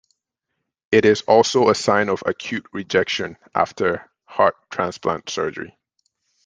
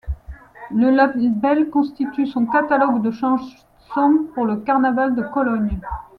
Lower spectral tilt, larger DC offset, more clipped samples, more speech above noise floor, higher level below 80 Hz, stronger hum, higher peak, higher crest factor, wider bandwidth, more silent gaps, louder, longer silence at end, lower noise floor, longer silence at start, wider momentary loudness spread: second, -4 dB/octave vs -9 dB/octave; neither; neither; first, 59 dB vs 20 dB; second, -60 dBFS vs -40 dBFS; neither; about the same, -2 dBFS vs -2 dBFS; about the same, 20 dB vs 16 dB; first, 9.8 kHz vs 6 kHz; neither; about the same, -20 LUFS vs -19 LUFS; first, 0.8 s vs 0.15 s; first, -79 dBFS vs -38 dBFS; first, 0.9 s vs 0.05 s; about the same, 12 LU vs 10 LU